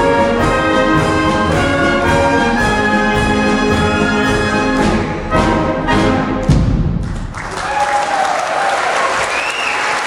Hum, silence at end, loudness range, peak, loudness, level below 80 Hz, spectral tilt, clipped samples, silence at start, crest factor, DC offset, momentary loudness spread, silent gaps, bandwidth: none; 0 s; 3 LU; 0 dBFS; -14 LUFS; -26 dBFS; -5 dB/octave; under 0.1%; 0 s; 12 dB; under 0.1%; 4 LU; none; 15.5 kHz